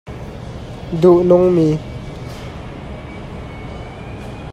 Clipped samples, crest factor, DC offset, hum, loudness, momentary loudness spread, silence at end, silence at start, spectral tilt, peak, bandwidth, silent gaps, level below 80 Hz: under 0.1%; 18 dB; under 0.1%; none; -13 LUFS; 19 LU; 0 s; 0.05 s; -8.5 dB/octave; 0 dBFS; 8.8 kHz; none; -36 dBFS